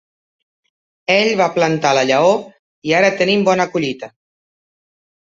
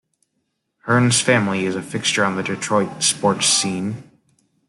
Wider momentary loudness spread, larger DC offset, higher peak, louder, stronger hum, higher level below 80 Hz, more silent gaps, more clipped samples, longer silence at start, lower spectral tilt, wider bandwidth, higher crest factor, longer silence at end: first, 13 LU vs 10 LU; neither; about the same, 0 dBFS vs -2 dBFS; first, -15 LUFS vs -18 LUFS; neither; about the same, -62 dBFS vs -62 dBFS; first, 2.59-2.82 s vs none; neither; first, 1.1 s vs 0.85 s; first, -4.5 dB/octave vs -3 dB/octave; second, 7.8 kHz vs 12.5 kHz; about the same, 16 dB vs 18 dB; first, 1.3 s vs 0.65 s